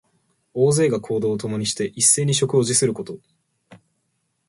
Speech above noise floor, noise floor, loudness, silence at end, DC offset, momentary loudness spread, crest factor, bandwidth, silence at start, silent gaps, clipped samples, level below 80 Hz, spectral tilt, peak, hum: 52 dB; -72 dBFS; -19 LUFS; 0.75 s; under 0.1%; 16 LU; 20 dB; 12 kHz; 0.55 s; none; under 0.1%; -60 dBFS; -4 dB/octave; -2 dBFS; none